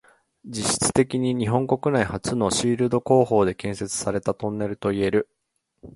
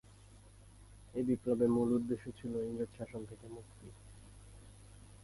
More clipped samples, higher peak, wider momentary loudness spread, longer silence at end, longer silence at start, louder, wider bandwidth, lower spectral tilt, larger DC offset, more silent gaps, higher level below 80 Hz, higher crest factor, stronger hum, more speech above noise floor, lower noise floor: neither; first, -4 dBFS vs -20 dBFS; second, 8 LU vs 26 LU; about the same, 0.05 s vs 0.05 s; first, 0.45 s vs 0.1 s; first, -23 LUFS vs -36 LUFS; about the same, 11.5 kHz vs 11.5 kHz; second, -5 dB/octave vs -8 dB/octave; neither; neither; first, -50 dBFS vs -60 dBFS; about the same, 20 dB vs 20 dB; neither; first, 32 dB vs 22 dB; second, -54 dBFS vs -59 dBFS